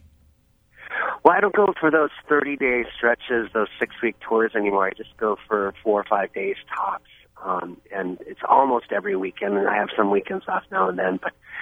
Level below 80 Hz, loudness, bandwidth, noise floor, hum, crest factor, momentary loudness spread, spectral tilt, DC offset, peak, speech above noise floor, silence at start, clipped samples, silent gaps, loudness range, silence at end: -60 dBFS; -23 LUFS; 3.8 kHz; -60 dBFS; none; 22 dB; 11 LU; -7.5 dB/octave; under 0.1%; 0 dBFS; 37 dB; 0.8 s; under 0.1%; none; 4 LU; 0 s